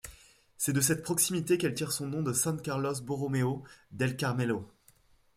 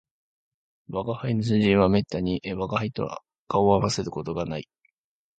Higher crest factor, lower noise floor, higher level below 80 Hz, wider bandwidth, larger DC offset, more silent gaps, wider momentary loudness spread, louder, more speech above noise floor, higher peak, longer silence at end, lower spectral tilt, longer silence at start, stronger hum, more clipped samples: about the same, 20 dB vs 20 dB; second, -64 dBFS vs -70 dBFS; second, -64 dBFS vs -50 dBFS; first, 16 kHz vs 9 kHz; neither; second, none vs 3.38-3.47 s; second, 7 LU vs 12 LU; second, -31 LUFS vs -25 LUFS; second, 33 dB vs 46 dB; second, -12 dBFS vs -6 dBFS; about the same, 0.7 s vs 0.75 s; second, -4.5 dB/octave vs -6.5 dB/octave; second, 0.05 s vs 0.9 s; neither; neither